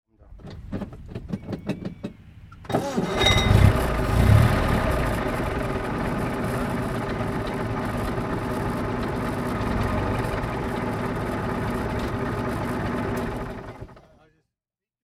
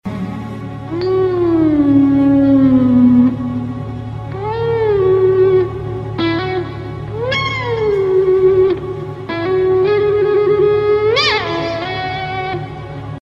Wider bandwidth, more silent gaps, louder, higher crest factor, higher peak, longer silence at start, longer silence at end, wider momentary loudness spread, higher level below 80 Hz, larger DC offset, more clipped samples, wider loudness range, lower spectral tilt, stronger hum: first, 15.5 kHz vs 7.4 kHz; neither; second, -25 LUFS vs -14 LUFS; first, 22 dB vs 12 dB; about the same, -2 dBFS vs -2 dBFS; first, 0.25 s vs 0.05 s; first, 1.05 s vs 0.05 s; first, 17 LU vs 14 LU; first, -32 dBFS vs -38 dBFS; neither; neither; first, 7 LU vs 4 LU; second, -6 dB/octave vs -7.5 dB/octave; neither